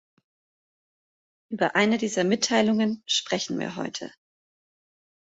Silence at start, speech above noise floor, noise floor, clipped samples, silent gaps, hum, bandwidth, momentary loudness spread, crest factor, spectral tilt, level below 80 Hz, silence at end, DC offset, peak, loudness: 1.5 s; over 65 dB; under -90 dBFS; under 0.1%; none; none; 8 kHz; 12 LU; 20 dB; -3.5 dB/octave; -70 dBFS; 1.2 s; under 0.1%; -8 dBFS; -25 LUFS